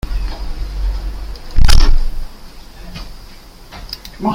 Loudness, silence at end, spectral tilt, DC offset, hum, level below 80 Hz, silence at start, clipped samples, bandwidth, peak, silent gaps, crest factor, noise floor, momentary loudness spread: -21 LUFS; 0 s; -4.5 dB/octave; under 0.1%; none; -16 dBFS; 0.05 s; 0.8%; 12 kHz; 0 dBFS; none; 14 dB; -36 dBFS; 24 LU